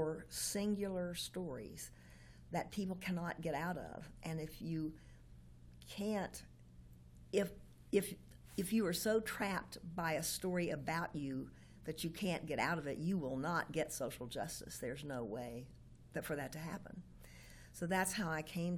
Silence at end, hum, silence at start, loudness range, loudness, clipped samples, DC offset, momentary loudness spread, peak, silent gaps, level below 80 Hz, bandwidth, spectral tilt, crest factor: 0 s; none; 0 s; 6 LU; -41 LUFS; under 0.1%; under 0.1%; 21 LU; -22 dBFS; none; -62 dBFS; 17.5 kHz; -4.5 dB/octave; 20 dB